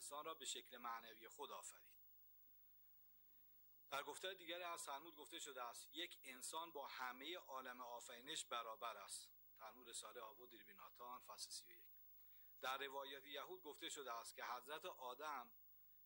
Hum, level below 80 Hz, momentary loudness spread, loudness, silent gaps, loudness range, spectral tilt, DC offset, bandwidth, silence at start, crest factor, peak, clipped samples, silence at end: 50 Hz at -90 dBFS; under -90 dBFS; 15 LU; -53 LUFS; none; 5 LU; 0 dB/octave; under 0.1%; 19 kHz; 0 s; 20 dB; -34 dBFS; under 0.1%; 0 s